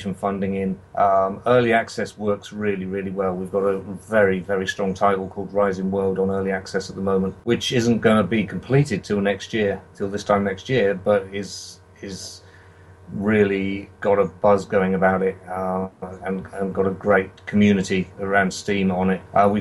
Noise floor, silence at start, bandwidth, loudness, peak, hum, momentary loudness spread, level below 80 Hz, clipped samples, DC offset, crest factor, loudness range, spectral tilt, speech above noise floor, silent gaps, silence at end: -47 dBFS; 0 s; 12 kHz; -22 LUFS; -4 dBFS; none; 10 LU; -54 dBFS; under 0.1%; under 0.1%; 18 dB; 3 LU; -6 dB/octave; 26 dB; none; 0 s